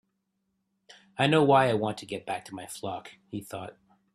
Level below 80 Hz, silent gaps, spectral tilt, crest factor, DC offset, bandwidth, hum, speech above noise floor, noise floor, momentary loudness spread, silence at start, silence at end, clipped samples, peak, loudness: -68 dBFS; none; -5.5 dB/octave; 20 dB; under 0.1%; 14 kHz; none; 51 dB; -78 dBFS; 19 LU; 1.2 s; 0.45 s; under 0.1%; -8 dBFS; -27 LUFS